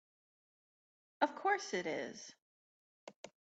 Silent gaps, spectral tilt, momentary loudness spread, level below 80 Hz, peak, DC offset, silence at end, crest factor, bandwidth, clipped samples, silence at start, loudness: 2.42-3.07 s, 3.16-3.24 s; -3 dB/octave; 22 LU; -90 dBFS; -18 dBFS; under 0.1%; 0.2 s; 24 dB; 9 kHz; under 0.1%; 1.2 s; -38 LUFS